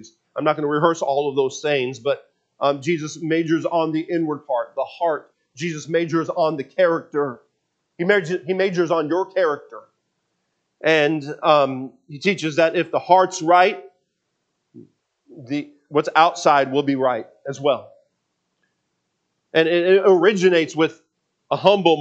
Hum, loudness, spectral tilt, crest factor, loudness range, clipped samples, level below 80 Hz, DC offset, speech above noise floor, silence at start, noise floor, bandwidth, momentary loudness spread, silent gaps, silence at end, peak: none; -20 LUFS; -5 dB/octave; 20 dB; 4 LU; under 0.1%; -76 dBFS; under 0.1%; 55 dB; 0.35 s; -74 dBFS; 8.4 kHz; 12 LU; none; 0 s; 0 dBFS